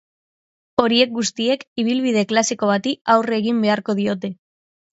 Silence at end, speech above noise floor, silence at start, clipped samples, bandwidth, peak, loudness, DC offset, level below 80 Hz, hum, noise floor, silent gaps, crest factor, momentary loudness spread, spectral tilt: 0.6 s; over 71 dB; 0.8 s; under 0.1%; 8 kHz; 0 dBFS; -19 LUFS; under 0.1%; -64 dBFS; none; under -90 dBFS; 1.67-1.76 s, 3.01-3.05 s; 20 dB; 5 LU; -4 dB/octave